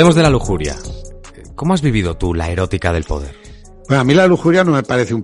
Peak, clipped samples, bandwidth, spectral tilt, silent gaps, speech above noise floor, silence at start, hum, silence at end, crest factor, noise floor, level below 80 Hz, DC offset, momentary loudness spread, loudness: 0 dBFS; under 0.1%; 11.5 kHz; -6 dB/octave; none; 21 dB; 0 s; none; 0 s; 14 dB; -35 dBFS; -30 dBFS; under 0.1%; 17 LU; -15 LUFS